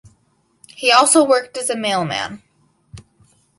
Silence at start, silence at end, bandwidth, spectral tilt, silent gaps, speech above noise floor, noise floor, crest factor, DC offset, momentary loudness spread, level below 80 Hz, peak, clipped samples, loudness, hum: 0.8 s; 0.6 s; 11.5 kHz; -2.5 dB/octave; none; 46 dB; -62 dBFS; 20 dB; under 0.1%; 12 LU; -58 dBFS; 0 dBFS; under 0.1%; -15 LUFS; none